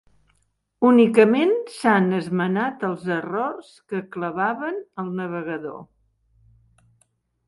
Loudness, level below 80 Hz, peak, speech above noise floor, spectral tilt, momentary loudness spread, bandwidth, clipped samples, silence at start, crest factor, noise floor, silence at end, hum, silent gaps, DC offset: -22 LUFS; -66 dBFS; -2 dBFS; 48 dB; -7 dB/octave; 15 LU; 11.5 kHz; under 0.1%; 0.8 s; 20 dB; -69 dBFS; 1.65 s; none; none; under 0.1%